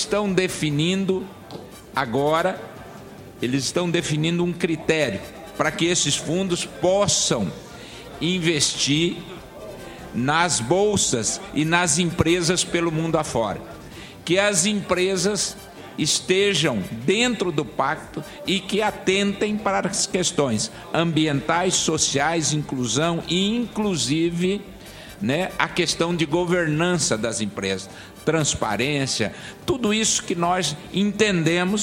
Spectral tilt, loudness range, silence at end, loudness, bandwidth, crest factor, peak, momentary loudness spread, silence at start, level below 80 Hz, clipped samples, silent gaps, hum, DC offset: -3.5 dB/octave; 3 LU; 0 s; -22 LUFS; 16.5 kHz; 20 dB; -2 dBFS; 15 LU; 0 s; -50 dBFS; under 0.1%; none; none; under 0.1%